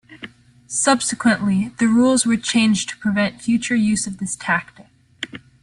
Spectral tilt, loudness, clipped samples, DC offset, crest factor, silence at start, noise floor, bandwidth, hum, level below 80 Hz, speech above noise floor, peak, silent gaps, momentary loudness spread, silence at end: -3.5 dB/octave; -19 LUFS; under 0.1%; under 0.1%; 16 dB; 0.1 s; -41 dBFS; 11.5 kHz; none; -56 dBFS; 22 dB; -4 dBFS; none; 16 LU; 0.25 s